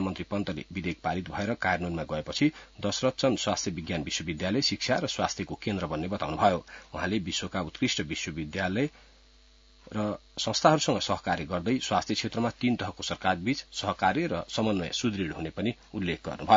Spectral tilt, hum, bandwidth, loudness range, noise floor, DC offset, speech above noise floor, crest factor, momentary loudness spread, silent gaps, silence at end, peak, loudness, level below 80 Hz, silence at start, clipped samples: -4.5 dB/octave; none; 7.8 kHz; 3 LU; -58 dBFS; under 0.1%; 29 dB; 24 dB; 7 LU; none; 0 s; -6 dBFS; -30 LUFS; -56 dBFS; 0 s; under 0.1%